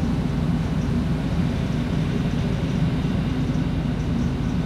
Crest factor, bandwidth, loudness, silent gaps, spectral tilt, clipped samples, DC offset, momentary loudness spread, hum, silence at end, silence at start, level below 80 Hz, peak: 12 dB; 11.5 kHz; -24 LUFS; none; -7.5 dB/octave; under 0.1%; under 0.1%; 1 LU; none; 0 s; 0 s; -32 dBFS; -10 dBFS